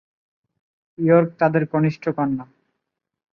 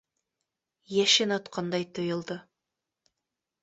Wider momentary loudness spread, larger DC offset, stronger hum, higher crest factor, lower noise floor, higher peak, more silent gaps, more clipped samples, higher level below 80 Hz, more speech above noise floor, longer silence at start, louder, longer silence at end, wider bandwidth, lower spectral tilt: second, 8 LU vs 14 LU; neither; neither; about the same, 20 dB vs 22 dB; second, -80 dBFS vs -87 dBFS; first, -2 dBFS vs -10 dBFS; neither; neither; first, -64 dBFS vs -74 dBFS; about the same, 61 dB vs 59 dB; about the same, 1 s vs 0.9 s; first, -20 LUFS vs -27 LUFS; second, 0.9 s vs 1.2 s; second, 6.4 kHz vs 8.4 kHz; first, -10 dB/octave vs -3 dB/octave